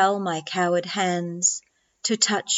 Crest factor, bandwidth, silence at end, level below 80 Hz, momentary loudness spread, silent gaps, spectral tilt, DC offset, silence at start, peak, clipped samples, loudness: 20 dB; 8.2 kHz; 0 s; -82 dBFS; 6 LU; none; -2.5 dB/octave; under 0.1%; 0 s; -4 dBFS; under 0.1%; -23 LUFS